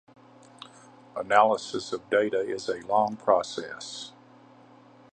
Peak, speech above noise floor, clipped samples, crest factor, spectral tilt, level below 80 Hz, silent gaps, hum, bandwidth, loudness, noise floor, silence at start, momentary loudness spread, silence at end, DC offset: -6 dBFS; 28 dB; under 0.1%; 24 dB; -3.5 dB/octave; -72 dBFS; none; none; 9.6 kHz; -26 LUFS; -54 dBFS; 0.6 s; 23 LU; 1.05 s; under 0.1%